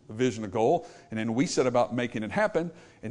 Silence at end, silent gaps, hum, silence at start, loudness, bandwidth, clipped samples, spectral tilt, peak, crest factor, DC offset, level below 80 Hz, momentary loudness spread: 0 s; none; none; 0.1 s; -28 LUFS; 11 kHz; under 0.1%; -5.5 dB/octave; -12 dBFS; 16 dB; under 0.1%; -62 dBFS; 10 LU